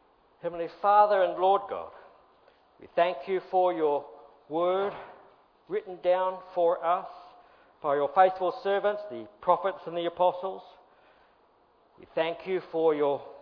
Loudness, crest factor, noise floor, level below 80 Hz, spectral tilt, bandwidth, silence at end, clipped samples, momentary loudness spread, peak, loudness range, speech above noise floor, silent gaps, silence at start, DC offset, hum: -28 LUFS; 20 dB; -64 dBFS; -72 dBFS; -8 dB/octave; 5.4 kHz; 0 s; under 0.1%; 14 LU; -8 dBFS; 4 LU; 37 dB; none; 0.45 s; under 0.1%; none